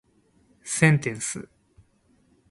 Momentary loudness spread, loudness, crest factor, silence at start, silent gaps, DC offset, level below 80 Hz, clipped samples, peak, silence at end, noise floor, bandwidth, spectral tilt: 17 LU; -23 LUFS; 24 dB; 0.65 s; none; under 0.1%; -60 dBFS; under 0.1%; -4 dBFS; 1.1 s; -63 dBFS; 11.5 kHz; -5 dB/octave